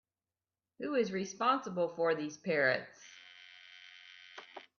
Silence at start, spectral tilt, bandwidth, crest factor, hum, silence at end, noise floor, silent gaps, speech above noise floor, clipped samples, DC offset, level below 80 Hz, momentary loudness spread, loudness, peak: 0.8 s; -4.5 dB/octave; 7 kHz; 20 dB; none; 0.15 s; under -90 dBFS; none; over 56 dB; under 0.1%; under 0.1%; -82 dBFS; 22 LU; -34 LUFS; -16 dBFS